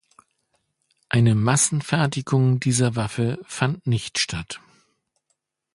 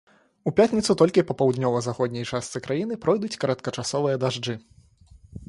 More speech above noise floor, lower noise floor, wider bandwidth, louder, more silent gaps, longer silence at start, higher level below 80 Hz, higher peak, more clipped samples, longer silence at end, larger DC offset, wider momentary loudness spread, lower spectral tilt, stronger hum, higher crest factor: first, 53 dB vs 30 dB; first, -75 dBFS vs -53 dBFS; about the same, 11.5 kHz vs 11.5 kHz; about the same, -22 LUFS vs -24 LUFS; neither; first, 1.1 s vs 0.45 s; about the same, -52 dBFS vs -56 dBFS; about the same, -4 dBFS vs -4 dBFS; neither; first, 1.15 s vs 0.05 s; neither; about the same, 8 LU vs 10 LU; about the same, -4.5 dB/octave vs -5.5 dB/octave; neither; about the same, 20 dB vs 20 dB